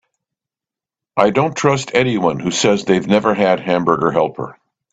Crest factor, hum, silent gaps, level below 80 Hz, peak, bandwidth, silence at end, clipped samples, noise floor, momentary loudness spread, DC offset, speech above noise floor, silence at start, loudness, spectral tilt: 16 dB; none; none; -54 dBFS; 0 dBFS; 9.2 kHz; 0.4 s; under 0.1%; -88 dBFS; 5 LU; under 0.1%; 73 dB; 1.15 s; -16 LUFS; -5 dB/octave